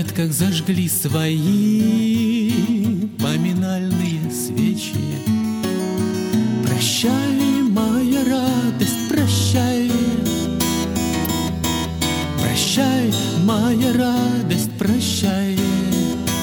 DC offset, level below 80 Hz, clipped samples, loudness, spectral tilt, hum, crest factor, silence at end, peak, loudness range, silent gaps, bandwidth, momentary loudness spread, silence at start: under 0.1%; -42 dBFS; under 0.1%; -19 LUFS; -5 dB/octave; none; 14 dB; 0 s; -4 dBFS; 3 LU; none; 17.5 kHz; 4 LU; 0 s